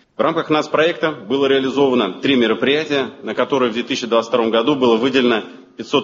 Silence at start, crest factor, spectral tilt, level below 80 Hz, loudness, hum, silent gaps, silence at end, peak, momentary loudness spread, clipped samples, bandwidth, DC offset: 0.2 s; 16 dB; -5 dB/octave; -60 dBFS; -17 LUFS; none; none; 0 s; -2 dBFS; 6 LU; under 0.1%; 7.6 kHz; under 0.1%